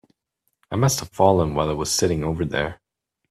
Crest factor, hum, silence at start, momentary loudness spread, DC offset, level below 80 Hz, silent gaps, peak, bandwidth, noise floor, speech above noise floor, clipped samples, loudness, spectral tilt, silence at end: 20 dB; none; 0.7 s; 8 LU; under 0.1%; -44 dBFS; none; -2 dBFS; 15.5 kHz; -75 dBFS; 54 dB; under 0.1%; -22 LUFS; -4.5 dB/octave; 0.55 s